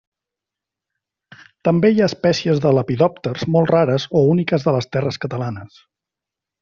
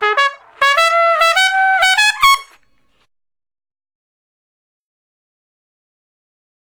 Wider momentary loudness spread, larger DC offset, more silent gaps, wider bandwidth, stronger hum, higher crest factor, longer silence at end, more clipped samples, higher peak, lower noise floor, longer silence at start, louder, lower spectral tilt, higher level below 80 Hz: first, 10 LU vs 6 LU; neither; neither; second, 7.2 kHz vs over 20 kHz; neither; about the same, 16 dB vs 18 dB; second, 0.95 s vs 4.35 s; neither; about the same, -2 dBFS vs 0 dBFS; first, -86 dBFS vs -60 dBFS; first, 1.65 s vs 0 s; second, -18 LUFS vs -12 LUFS; first, -7 dB/octave vs 2 dB/octave; about the same, -56 dBFS vs -54 dBFS